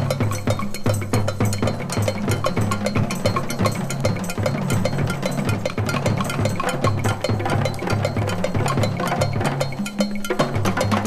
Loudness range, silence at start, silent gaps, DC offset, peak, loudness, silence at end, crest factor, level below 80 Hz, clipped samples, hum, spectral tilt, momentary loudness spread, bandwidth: 1 LU; 0 s; none; under 0.1%; -4 dBFS; -22 LUFS; 0 s; 18 dB; -38 dBFS; under 0.1%; none; -5.5 dB/octave; 2 LU; 15 kHz